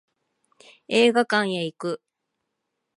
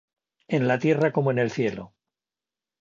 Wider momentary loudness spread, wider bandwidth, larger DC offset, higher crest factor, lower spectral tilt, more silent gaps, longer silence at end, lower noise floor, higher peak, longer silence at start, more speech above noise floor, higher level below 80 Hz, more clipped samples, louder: first, 13 LU vs 7 LU; first, 11.5 kHz vs 7.6 kHz; neither; about the same, 20 dB vs 18 dB; second, -4.5 dB/octave vs -7.5 dB/octave; neither; about the same, 1 s vs 0.95 s; second, -80 dBFS vs under -90 dBFS; about the same, -6 dBFS vs -8 dBFS; first, 0.9 s vs 0.5 s; second, 58 dB vs over 67 dB; second, -78 dBFS vs -66 dBFS; neither; about the same, -22 LUFS vs -24 LUFS